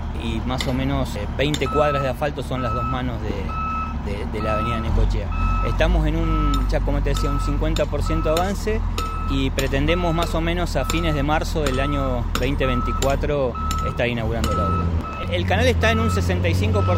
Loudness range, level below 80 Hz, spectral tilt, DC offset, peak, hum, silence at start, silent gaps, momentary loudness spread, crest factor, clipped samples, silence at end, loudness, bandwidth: 2 LU; -26 dBFS; -6 dB/octave; under 0.1%; -4 dBFS; none; 0 s; none; 6 LU; 16 dB; under 0.1%; 0 s; -22 LUFS; 16 kHz